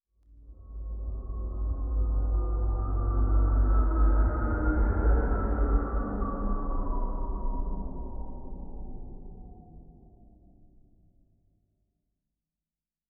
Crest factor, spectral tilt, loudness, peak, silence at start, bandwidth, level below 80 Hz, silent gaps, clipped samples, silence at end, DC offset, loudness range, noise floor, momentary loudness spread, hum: 16 dB; -7 dB/octave; -30 LUFS; -14 dBFS; 0.35 s; 2.1 kHz; -30 dBFS; none; under 0.1%; 3.2 s; under 0.1%; 18 LU; under -90 dBFS; 18 LU; none